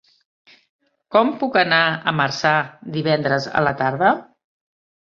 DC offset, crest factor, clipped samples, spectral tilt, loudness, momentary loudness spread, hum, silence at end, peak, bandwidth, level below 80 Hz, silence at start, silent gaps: under 0.1%; 18 dB; under 0.1%; -5.5 dB/octave; -19 LUFS; 5 LU; none; 0.85 s; -2 dBFS; 7.4 kHz; -60 dBFS; 1.1 s; none